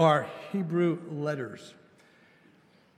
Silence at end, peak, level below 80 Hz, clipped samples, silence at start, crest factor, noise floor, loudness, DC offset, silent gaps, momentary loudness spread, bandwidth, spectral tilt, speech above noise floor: 1.25 s; -10 dBFS; -82 dBFS; under 0.1%; 0 s; 22 dB; -61 dBFS; -30 LUFS; under 0.1%; none; 16 LU; 12 kHz; -7 dB/octave; 34 dB